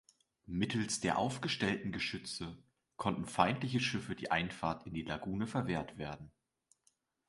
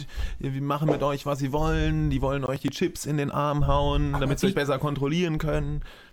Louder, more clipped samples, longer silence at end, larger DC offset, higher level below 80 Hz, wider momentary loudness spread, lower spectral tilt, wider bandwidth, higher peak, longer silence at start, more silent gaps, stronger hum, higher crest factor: second, -37 LUFS vs -26 LUFS; neither; first, 1 s vs 0.1 s; neither; second, -62 dBFS vs -34 dBFS; first, 10 LU vs 6 LU; second, -4.5 dB/octave vs -6.5 dB/octave; second, 11.5 kHz vs 17 kHz; about the same, -12 dBFS vs -10 dBFS; first, 0.5 s vs 0 s; neither; neither; first, 24 dB vs 16 dB